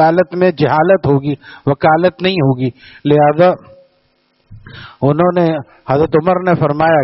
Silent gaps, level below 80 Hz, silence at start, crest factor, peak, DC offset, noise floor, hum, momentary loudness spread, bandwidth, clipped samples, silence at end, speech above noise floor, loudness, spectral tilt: none; -46 dBFS; 0 s; 14 dB; 0 dBFS; under 0.1%; -59 dBFS; none; 10 LU; 5.8 kHz; under 0.1%; 0 s; 46 dB; -13 LUFS; -6 dB/octave